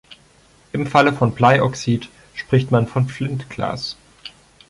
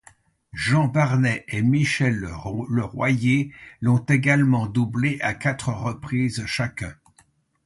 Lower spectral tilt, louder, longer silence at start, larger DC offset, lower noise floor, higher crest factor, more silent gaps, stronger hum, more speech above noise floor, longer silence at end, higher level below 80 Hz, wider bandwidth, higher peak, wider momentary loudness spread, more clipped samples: about the same, -6.5 dB/octave vs -6.5 dB/octave; first, -19 LUFS vs -22 LUFS; second, 0.1 s vs 0.55 s; neither; second, -52 dBFS vs -60 dBFS; about the same, 18 dB vs 16 dB; neither; neither; second, 34 dB vs 39 dB; second, 0.4 s vs 0.7 s; about the same, -50 dBFS vs -50 dBFS; about the same, 11.5 kHz vs 11.5 kHz; first, -2 dBFS vs -6 dBFS; first, 19 LU vs 10 LU; neither